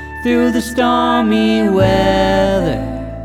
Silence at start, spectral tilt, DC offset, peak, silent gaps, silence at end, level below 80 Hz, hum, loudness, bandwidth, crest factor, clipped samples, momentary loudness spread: 0 s; -6 dB/octave; under 0.1%; 0 dBFS; none; 0 s; -30 dBFS; none; -14 LUFS; 16 kHz; 14 dB; under 0.1%; 5 LU